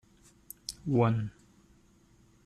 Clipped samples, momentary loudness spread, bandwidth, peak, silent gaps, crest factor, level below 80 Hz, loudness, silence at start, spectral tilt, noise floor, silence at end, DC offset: under 0.1%; 16 LU; 14.5 kHz; -14 dBFS; none; 20 dB; -62 dBFS; -31 LUFS; 0.7 s; -7 dB/octave; -63 dBFS; 1.15 s; under 0.1%